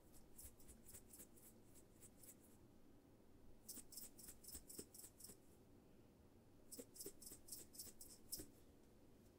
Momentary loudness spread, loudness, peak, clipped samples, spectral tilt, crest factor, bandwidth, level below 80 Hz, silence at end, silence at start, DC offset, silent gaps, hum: 12 LU; -59 LUFS; -34 dBFS; under 0.1%; -2.5 dB/octave; 28 dB; 16 kHz; -74 dBFS; 0 s; 0 s; under 0.1%; none; none